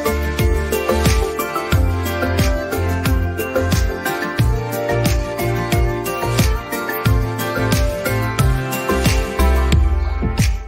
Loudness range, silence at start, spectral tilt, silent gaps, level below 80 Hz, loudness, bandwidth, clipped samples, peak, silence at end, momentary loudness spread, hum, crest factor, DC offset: 1 LU; 0 s; -5.5 dB/octave; none; -22 dBFS; -18 LUFS; 16.5 kHz; under 0.1%; -4 dBFS; 0 s; 4 LU; none; 14 dB; under 0.1%